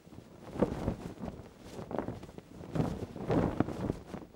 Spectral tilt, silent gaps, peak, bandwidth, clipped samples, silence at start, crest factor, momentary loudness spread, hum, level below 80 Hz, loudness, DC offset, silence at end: -8 dB/octave; none; -12 dBFS; 16.5 kHz; under 0.1%; 0.05 s; 24 dB; 17 LU; none; -50 dBFS; -36 LUFS; under 0.1%; 0 s